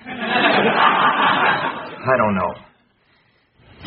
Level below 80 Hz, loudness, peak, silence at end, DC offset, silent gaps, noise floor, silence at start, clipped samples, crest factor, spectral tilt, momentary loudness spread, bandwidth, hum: -56 dBFS; -17 LUFS; -2 dBFS; 0 s; under 0.1%; none; -59 dBFS; 0.05 s; under 0.1%; 18 dB; -2 dB/octave; 10 LU; 5 kHz; none